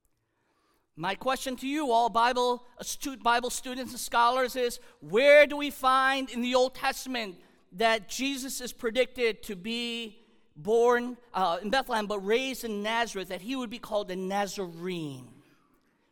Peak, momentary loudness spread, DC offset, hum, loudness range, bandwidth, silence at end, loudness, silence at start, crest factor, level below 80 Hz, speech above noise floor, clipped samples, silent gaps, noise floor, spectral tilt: -8 dBFS; 12 LU; under 0.1%; none; 7 LU; 18.5 kHz; 0.85 s; -28 LUFS; 0.95 s; 22 dB; -58 dBFS; 46 dB; under 0.1%; none; -74 dBFS; -3 dB/octave